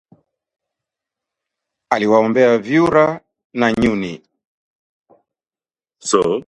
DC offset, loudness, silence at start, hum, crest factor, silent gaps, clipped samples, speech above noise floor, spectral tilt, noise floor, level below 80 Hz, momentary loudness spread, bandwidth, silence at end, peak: under 0.1%; -16 LUFS; 1.9 s; none; 18 dB; 3.44-3.50 s, 4.45-5.05 s; under 0.1%; over 75 dB; -5 dB/octave; under -90 dBFS; -50 dBFS; 16 LU; 11 kHz; 0.05 s; 0 dBFS